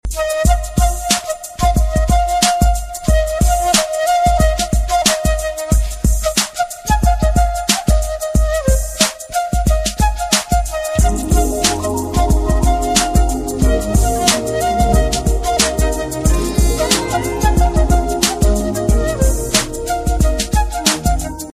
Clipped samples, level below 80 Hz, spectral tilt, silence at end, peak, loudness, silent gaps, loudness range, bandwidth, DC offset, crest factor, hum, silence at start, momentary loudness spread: under 0.1%; -18 dBFS; -4 dB/octave; 0.05 s; 0 dBFS; -16 LUFS; none; 1 LU; 15.5 kHz; under 0.1%; 14 dB; none; 0.05 s; 5 LU